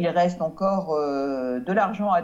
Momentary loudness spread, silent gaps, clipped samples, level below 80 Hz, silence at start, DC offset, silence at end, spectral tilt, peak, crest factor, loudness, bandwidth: 4 LU; none; under 0.1%; -58 dBFS; 0 s; under 0.1%; 0 s; -7.5 dB/octave; -10 dBFS; 14 dB; -24 LUFS; 7.8 kHz